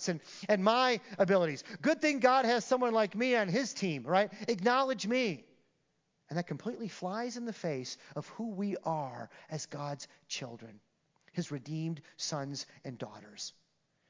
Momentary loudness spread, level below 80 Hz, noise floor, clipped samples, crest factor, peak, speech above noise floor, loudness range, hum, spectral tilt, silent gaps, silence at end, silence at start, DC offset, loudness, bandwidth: 16 LU; -88 dBFS; -78 dBFS; under 0.1%; 22 dB; -12 dBFS; 45 dB; 11 LU; none; -4.5 dB/octave; none; 0.6 s; 0 s; under 0.1%; -33 LUFS; 7.6 kHz